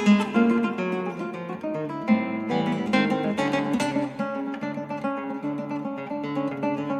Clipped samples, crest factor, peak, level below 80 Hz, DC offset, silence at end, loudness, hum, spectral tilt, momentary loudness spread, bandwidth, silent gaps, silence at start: under 0.1%; 18 dB; -8 dBFS; -66 dBFS; under 0.1%; 0 s; -26 LUFS; none; -6.5 dB/octave; 9 LU; 11 kHz; none; 0 s